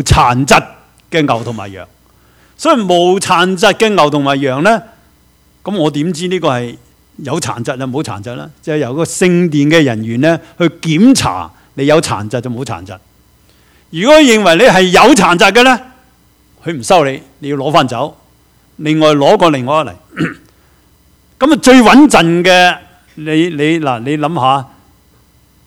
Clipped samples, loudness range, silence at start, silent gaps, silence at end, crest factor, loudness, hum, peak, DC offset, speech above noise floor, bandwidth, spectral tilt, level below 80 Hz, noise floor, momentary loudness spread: 0.9%; 8 LU; 0 s; none; 1 s; 12 dB; -10 LUFS; none; 0 dBFS; under 0.1%; 39 dB; 17 kHz; -4.5 dB/octave; -36 dBFS; -49 dBFS; 16 LU